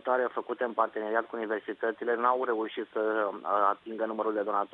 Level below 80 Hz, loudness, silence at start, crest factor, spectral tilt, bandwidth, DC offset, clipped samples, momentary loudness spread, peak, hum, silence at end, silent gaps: -80 dBFS; -30 LUFS; 0.05 s; 20 dB; -7 dB/octave; 4.6 kHz; under 0.1%; under 0.1%; 6 LU; -10 dBFS; none; 0.05 s; none